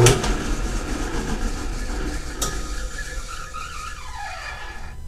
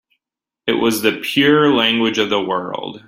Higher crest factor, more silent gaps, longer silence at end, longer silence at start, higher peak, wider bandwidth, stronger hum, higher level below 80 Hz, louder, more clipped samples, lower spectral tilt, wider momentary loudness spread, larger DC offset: first, 24 dB vs 18 dB; neither; about the same, 0 s vs 0.1 s; second, 0 s vs 0.65 s; about the same, 0 dBFS vs 0 dBFS; about the same, 15.5 kHz vs 16.5 kHz; neither; first, -28 dBFS vs -58 dBFS; second, -28 LUFS vs -16 LUFS; neither; about the same, -4 dB/octave vs -4 dB/octave; about the same, 8 LU vs 10 LU; neither